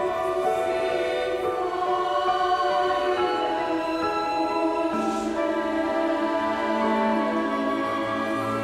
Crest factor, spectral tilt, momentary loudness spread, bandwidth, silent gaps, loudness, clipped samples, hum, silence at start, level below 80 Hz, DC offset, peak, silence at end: 14 dB; -5 dB/octave; 3 LU; 14.5 kHz; none; -25 LUFS; under 0.1%; none; 0 s; -56 dBFS; under 0.1%; -12 dBFS; 0 s